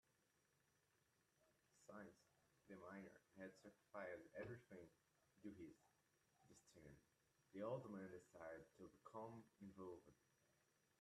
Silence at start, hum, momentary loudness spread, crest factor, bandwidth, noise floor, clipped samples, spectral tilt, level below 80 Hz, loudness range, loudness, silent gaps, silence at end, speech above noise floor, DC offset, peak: 1.4 s; none; 12 LU; 22 dB; 13 kHz; -85 dBFS; under 0.1%; -6.5 dB/octave; -88 dBFS; 7 LU; -60 LUFS; none; 0.5 s; 27 dB; under 0.1%; -38 dBFS